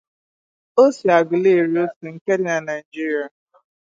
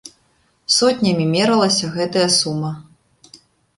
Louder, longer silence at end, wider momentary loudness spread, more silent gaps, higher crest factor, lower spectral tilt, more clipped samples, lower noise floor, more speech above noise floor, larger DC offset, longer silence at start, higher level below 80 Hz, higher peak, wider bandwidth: second, -19 LUFS vs -16 LUFS; first, 0.65 s vs 0.4 s; about the same, 11 LU vs 12 LU; first, 1.96-2.01 s, 2.21-2.26 s, 2.85-2.92 s vs none; about the same, 18 dB vs 18 dB; first, -6 dB/octave vs -4 dB/octave; neither; first, under -90 dBFS vs -61 dBFS; first, over 72 dB vs 44 dB; neither; first, 0.75 s vs 0.05 s; second, -72 dBFS vs -58 dBFS; about the same, -2 dBFS vs -2 dBFS; second, 7.8 kHz vs 11.5 kHz